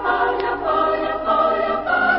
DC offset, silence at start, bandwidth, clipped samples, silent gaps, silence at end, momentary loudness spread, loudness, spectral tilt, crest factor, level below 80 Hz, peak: under 0.1%; 0 s; 5.8 kHz; under 0.1%; none; 0 s; 3 LU; -19 LUFS; -9 dB/octave; 14 dB; -46 dBFS; -4 dBFS